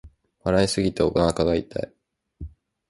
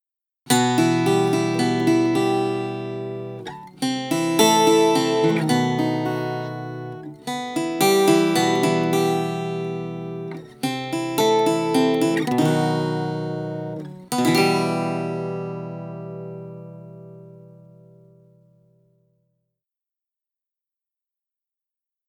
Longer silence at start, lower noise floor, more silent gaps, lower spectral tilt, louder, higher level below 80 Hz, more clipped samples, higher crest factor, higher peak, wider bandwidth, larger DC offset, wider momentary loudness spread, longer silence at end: second, 0.05 s vs 0.45 s; second, -41 dBFS vs -88 dBFS; neither; about the same, -5.5 dB/octave vs -5 dB/octave; about the same, -23 LUFS vs -21 LUFS; first, -42 dBFS vs -68 dBFS; neither; about the same, 20 dB vs 20 dB; second, -6 dBFS vs -2 dBFS; second, 11.5 kHz vs 19.5 kHz; neither; first, 21 LU vs 17 LU; second, 0.4 s vs 4.6 s